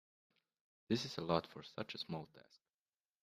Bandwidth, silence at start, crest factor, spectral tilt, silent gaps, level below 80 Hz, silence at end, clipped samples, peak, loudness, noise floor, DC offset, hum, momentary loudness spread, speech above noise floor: 15 kHz; 0.9 s; 26 dB; -5.5 dB/octave; none; -76 dBFS; 0.85 s; under 0.1%; -18 dBFS; -42 LUFS; under -90 dBFS; under 0.1%; none; 11 LU; over 48 dB